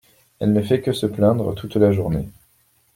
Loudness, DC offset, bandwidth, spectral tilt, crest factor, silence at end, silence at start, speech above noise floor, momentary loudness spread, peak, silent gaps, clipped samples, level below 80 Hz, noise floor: -20 LUFS; under 0.1%; 16.5 kHz; -8 dB/octave; 18 dB; 0.65 s; 0.4 s; 42 dB; 7 LU; -4 dBFS; none; under 0.1%; -46 dBFS; -61 dBFS